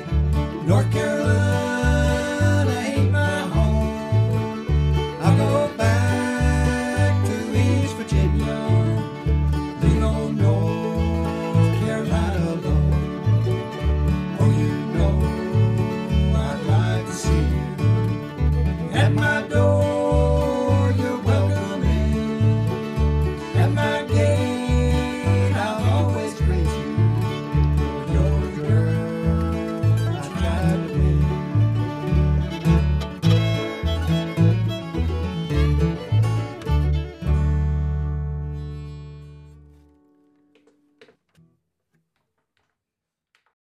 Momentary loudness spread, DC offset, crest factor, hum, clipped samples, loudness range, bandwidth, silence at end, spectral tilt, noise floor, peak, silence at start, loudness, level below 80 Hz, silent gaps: 5 LU; under 0.1%; 16 dB; none; under 0.1%; 3 LU; 12.5 kHz; 4.1 s; -7 dB/octave; -85 dBFS; -4 dBFS; 0 s; -21 LUFS; -28 dBFS; none